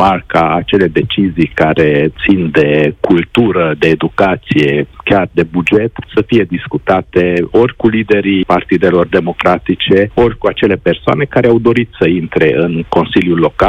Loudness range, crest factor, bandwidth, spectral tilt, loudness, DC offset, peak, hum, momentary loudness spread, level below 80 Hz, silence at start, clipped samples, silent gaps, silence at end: 1 LU; 10 dB; 8.8 kHz; -8 dB/octave; -11 LUFS; under 0.1%; 0 dBFS; none; 3 LU; -36 dBFS; 0 s; 0.3%; none; 0 s